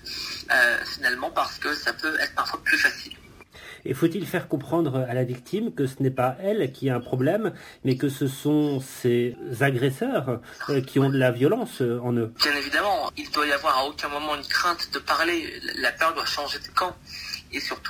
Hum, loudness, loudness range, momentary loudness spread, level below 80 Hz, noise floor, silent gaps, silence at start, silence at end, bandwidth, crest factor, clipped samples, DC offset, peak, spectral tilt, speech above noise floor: none; -25 LUFS; 3 LU; 9 LU; -56 dBFS; -47 dBFS; none; 0.05 s; 0 s; 16 kHz; 20 dB; under 0.1%; under 0.1%; -6 dBFS; -5 dB/octave; 22 dB